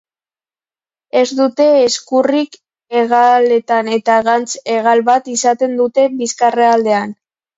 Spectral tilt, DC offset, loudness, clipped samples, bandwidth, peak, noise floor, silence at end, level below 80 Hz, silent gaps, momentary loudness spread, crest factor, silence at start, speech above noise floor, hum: -3 dB/octave; under 0.1%; -13 LUFS; under 0.1%; 8 kHz; 0 dBFS; under -90 dBFS; 0.45 s; -64 dBFS; none; 7 LU; 14 dB; 1.15 s; over 77 dB; none